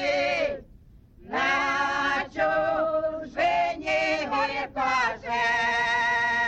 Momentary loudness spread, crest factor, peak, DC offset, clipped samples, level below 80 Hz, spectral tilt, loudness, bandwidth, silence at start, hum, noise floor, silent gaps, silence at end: 5 LU; 12 dB; -14 dBFS; under 0.1%; under 0.1%; -54 dBFS; -3 dB/octave; -25 LUFS; 8.6 kHz; 0 s; none; -51 dBFS; none; 0 s